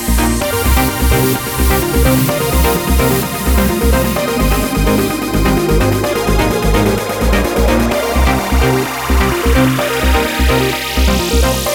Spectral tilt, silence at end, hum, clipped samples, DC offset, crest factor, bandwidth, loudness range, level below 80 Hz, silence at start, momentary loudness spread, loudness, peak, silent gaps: -5 dB/octave; 0 s; none; under 0.1%; 0.4%; 12 dB; over 20 kHz; 1 LU; -18 dBFS; 0 s; 2 LU; -13 LUFS; 0 dBFS; none